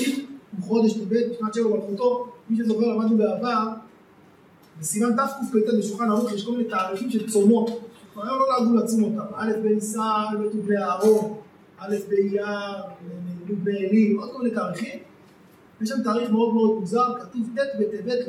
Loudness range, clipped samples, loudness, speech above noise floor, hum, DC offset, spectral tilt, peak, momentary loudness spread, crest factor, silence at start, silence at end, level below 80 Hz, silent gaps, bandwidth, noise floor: 3 LU; under 0.1%; -23 LUFS; 30 dB; none; under 0.1%; -6 dB/octave; -6 dBFS; 13 LU; 16 dB; 0 s; 0 s; -74 dBFS; none; 14.5 kHz; -53 dBFS